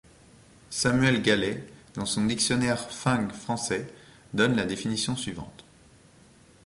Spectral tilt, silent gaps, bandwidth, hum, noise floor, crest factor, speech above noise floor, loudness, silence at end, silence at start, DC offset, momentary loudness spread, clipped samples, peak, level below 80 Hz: -4 dB/octave; none; 11.5 kHz; none; -56 dBFS; 22 dB; 29 dB; -27 LUFS; 1.15 s; 0.7 s; under 0.1%; 13 LU; under 0.1%; -6 dBFS; -54 dBFS